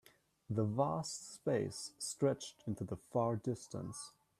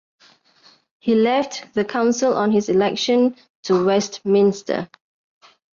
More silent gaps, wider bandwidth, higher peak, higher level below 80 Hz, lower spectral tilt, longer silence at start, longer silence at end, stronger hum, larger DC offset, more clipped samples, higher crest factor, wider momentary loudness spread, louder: second, none vs 3.50-3.63 s; first, 14.5 kHz vs 7.4 kHz; second, -22 dBFS vs -6 dBFS; second, -72 dBFS vs -64 dBFS; about the same, -5.5 dB/octave vs -5 dB/octave; second, 0.5 s vs 1.05 s; second, 0.3 s vs 0.9 s; neither; neither; neither; about the same, 18 dB vs 14 dB; about the same, 9 LU vs 9 LU; second, -39 LUFS vs -19 LUFS